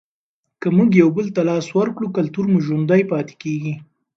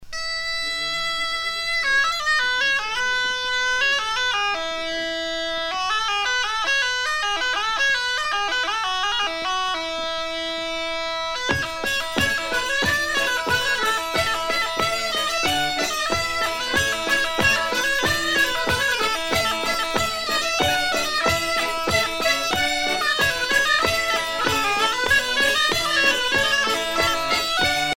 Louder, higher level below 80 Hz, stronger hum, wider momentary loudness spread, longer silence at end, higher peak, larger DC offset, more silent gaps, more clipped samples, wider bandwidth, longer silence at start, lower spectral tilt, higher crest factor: first, -18 LUFS vs -21 LUFS; second, -62 dBFS vs -46 dBFS; neither; first, 11 LU vs 6 LU; first, 0.35 s vs 0 s; about the same, 0 dBFS vs -2 dBFS; neither; neither; neither; second, 7.4 kHz vs 17 kHz; first, 0.6 s vs 0 s; first, -8 dB/octave vs -1.5 dB/octave; about the same, 18 dB vs 20 dB